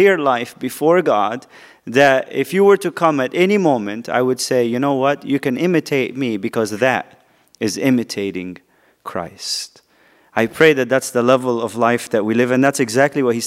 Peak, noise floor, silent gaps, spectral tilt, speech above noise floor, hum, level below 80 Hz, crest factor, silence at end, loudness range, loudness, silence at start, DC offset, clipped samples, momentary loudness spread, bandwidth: 0 dBFS; -54 dBFS; none; -5 dB/octave; 37 dB; none; -66 dBFS; 18 dB; 0 s; 6 LU; -17 LUFS; 0 s; under 0.1%; under 0.1%; 12 LU; 16 kHz